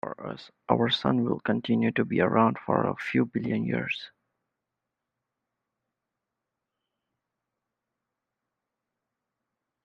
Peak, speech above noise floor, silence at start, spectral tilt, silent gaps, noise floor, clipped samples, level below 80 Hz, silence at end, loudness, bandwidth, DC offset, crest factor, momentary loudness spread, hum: -6 dBFS; 60 dB; 0.05 s; -7.5 dB/octave; none; -86 dBFS; under 0.1%; -68 dBFS; 5.75 s; -27 LUFS; 7.2 kHz; under 0.1%; 26 dB; 12 LU; none